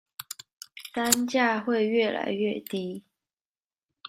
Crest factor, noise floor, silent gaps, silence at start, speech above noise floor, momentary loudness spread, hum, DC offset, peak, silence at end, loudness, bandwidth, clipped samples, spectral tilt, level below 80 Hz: 26 dB; under -90 dBFS; 0.53-0.61 s, 3.33-3.61 s; 0.2 s; over 64 dB; 17 LU; none; under 0.1%; -2 dBFS; 0 s; -26 LUFS; 16 kHz; under 0.1%; -3 dB/octave; -72 dBFS